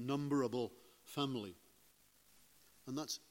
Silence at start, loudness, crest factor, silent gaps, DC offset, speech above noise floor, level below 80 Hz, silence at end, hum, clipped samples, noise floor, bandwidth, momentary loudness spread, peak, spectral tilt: 0 s; -41 LUFS; 20 dB; none; under 0.1%; 30 dB; -82 dBFS; 0.15 s; 50 Hz at -75 dBFS; under 0.1%; -70 dBFS; 16.5 kHz; 21 LU; -24 dBFS; -5 dB/octave